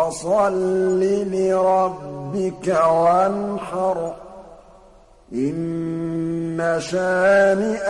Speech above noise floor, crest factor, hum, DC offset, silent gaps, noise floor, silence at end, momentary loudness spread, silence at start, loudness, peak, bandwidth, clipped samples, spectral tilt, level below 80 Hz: 30 dB; 14 dB; none; under 0.1%; none; -49 dBFS; 0 s; 10 LU; 0 s; -20 LUFS; -6 dBFS; 11.5 kHz; under 0.1%; -6 dB/octave; -52 dBFS